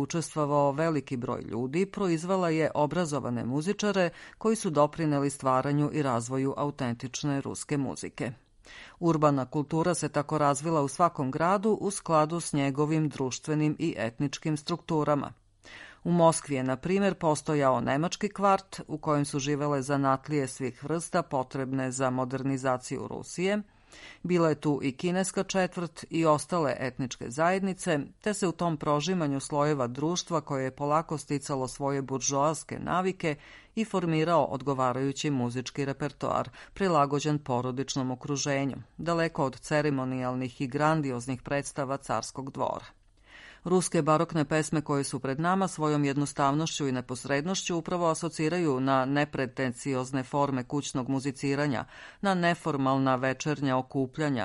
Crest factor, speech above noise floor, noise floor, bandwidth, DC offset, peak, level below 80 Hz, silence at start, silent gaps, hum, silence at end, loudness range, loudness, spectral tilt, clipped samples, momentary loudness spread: 18 dB; 25 dB; -54 dBFS; 11.5 kHz; under 0.1%; -10 dBFS; -60 dBFS; 0 s; none; none; 0 s; 3 LU; -29 LUFS; -5.5 dB/octave; under 0.1%; 7 LU